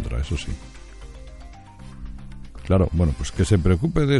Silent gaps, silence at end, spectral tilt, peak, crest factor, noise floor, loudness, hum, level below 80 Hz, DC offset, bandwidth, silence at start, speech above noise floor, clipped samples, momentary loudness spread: none; 0 s; -7 dB/octave; -4 dBFS; 18 dB; -41 dBFS; -22 LUFS; none; -32 dBFS; under 0.1%; 11.5 kHz; 0 s; 21 dB; under 0.1%; 24 LU